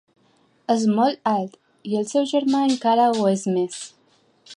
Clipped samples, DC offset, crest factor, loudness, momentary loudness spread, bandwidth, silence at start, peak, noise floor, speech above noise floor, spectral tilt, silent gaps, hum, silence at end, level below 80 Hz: under 0.1%; under 0.1%; 16 dB; -21 LUFS; 17 LU; 11.5 kHz; 0.7 s; -6 dBFS; -61 dBFS; 41 dB; -5.5 dB/octave; none; none; 0 s; -74 dBFS